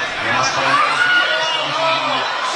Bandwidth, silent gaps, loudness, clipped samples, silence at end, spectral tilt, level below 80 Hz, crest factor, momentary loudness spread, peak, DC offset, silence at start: 11.5 kHz; none; -15 LUFS; under 0.1%; 0 s; -1.5 dB/octave; -56 dBFS; 14 dB; 4 LU; -4 dBFS; under 0.1%; 0 s